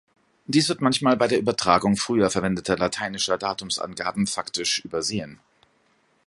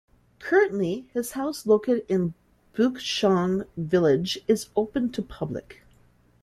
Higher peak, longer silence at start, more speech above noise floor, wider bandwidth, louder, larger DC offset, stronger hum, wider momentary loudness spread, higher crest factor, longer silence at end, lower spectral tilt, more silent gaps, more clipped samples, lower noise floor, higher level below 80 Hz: first, -2 dBFS vs -8 dBFS; about the same, 0.5 s vs 0.4 s; first, 41 dB vs 35 dB; second, 11.5 kHz vs 14 kHz; about the same, -23 LUFS vs -25 LUFS; neither; neither; second, 7 LU vs 11 LU; about the same, 22 dB vs 18 dB; first, 0.9 s vs 0.7 s; second, -4 dB/octave vs -5.5 dB/octave; neither; neither; first, -65 dBFS vs -59 dBFS; about the same, -56 dBFS vs -58 dBFS